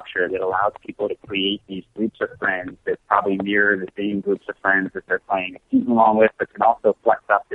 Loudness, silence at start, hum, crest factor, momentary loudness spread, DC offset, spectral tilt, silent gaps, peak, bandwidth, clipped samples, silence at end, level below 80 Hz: -21 LUFS; 0 s; none; 18 dB; 10 LU; under 0.1%; -7.5 dB/octave; none; -2 dBFS; 4.1 kHz; under 0.1%; 0 s; -60 dBFS